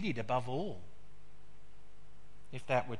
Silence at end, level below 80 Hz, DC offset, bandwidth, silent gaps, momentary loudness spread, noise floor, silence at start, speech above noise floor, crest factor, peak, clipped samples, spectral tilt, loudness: 0 s; -64 dBFS; 1%; 11.5 kHz; none; 17 LU; -62 dBFS; 0 s; 26 dB; 22 dB; -18 dBFS; under 0.1%; -6.5 dB/octave; -38 LUFS